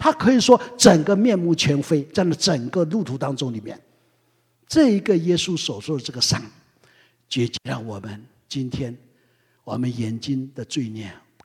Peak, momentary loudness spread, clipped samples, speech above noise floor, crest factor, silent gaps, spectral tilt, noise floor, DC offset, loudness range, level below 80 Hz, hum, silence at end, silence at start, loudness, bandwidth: 0 dBFS; 17 LU; under 0.1%; 44 dB; 22 dB; none; -5 dB/octave; -65 dBFS; under 0.1%; 11 LU; -54 dBFS; none; 0.3 s; 0 s; -21 LUFS; 15.5 kHz